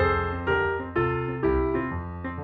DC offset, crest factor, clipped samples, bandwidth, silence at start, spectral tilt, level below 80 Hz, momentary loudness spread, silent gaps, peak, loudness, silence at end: under 0.1%; 16 dB; under 0.1%; 5 kHz; 0 s; -9.5 dB/octave; -38 dBFS; 8 LU; none; -10 dBFS; -26 LUFS; 0 s